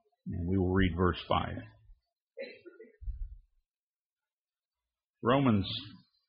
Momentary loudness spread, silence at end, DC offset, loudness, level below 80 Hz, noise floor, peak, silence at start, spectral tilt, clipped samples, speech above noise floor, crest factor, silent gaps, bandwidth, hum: 20 LU; 0.3 s; under 0.1%; -31 LUFS; -48 dBFS; under -90 dBFS; -14 dBFS; 0.25 s; -5.5 dB/octave; under 0.1%; over 60 dB; 20 dB; 2.22-2.27 s, 3.77-4.16 s, 4.33-4.45 s, 4.65-4.69 s, 5.04-5.14 s; 5.2 kHz; none